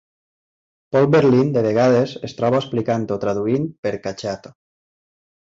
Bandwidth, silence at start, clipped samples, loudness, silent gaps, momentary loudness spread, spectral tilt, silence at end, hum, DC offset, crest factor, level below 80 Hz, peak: 7.8 kHz; 0.9 s; under 0.1%; -19 LUFS; 3.78-3.83 s; 12 LU; -7.5 dB/octave; 1.1 s; none; under 0.1%; 16 dB; -56 dBFS; -4 dBFS